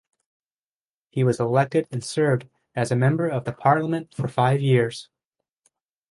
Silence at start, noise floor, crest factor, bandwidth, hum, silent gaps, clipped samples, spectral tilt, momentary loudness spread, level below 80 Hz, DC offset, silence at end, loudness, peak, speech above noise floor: 1.15 s; under -90 dBFS; 18 dB; 11.5 kHz; none; none; under 0.1%; -7 dB/octave; 8 LU; -62 dBFS; under 0.1%; 1.1 s; -23 LUFS; -4 dBFS; over 68 dB